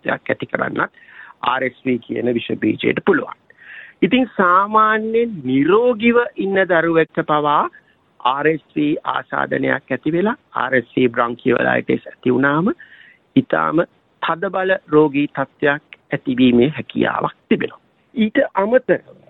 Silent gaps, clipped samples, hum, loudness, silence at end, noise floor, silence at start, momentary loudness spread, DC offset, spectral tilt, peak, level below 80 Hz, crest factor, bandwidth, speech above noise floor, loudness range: none; under 0.1%; none; -18 LUFS; 0.3 s; -40 dBFS; 0.05 s; 8 LU; under 0.1%; -9.5 dB/octave; -2 dBFS; -56 dBFS; 16 dB; 4.1 kHz; 23 dB; 4 LU